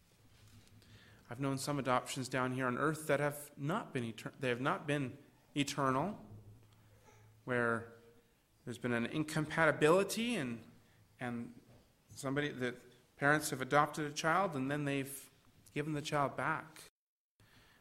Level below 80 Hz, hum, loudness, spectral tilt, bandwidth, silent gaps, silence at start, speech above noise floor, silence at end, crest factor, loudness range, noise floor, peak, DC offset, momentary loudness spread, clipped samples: -70 dBFS; none; -36 LUFS; -5 dB/octave; 16 kHz; none; 0.55 s; 33 dB; 0.95 s; 24 dB; 5 LU; -69 dBFS; -14 dBFS; under 0.1%; 15 LU; under 0.1%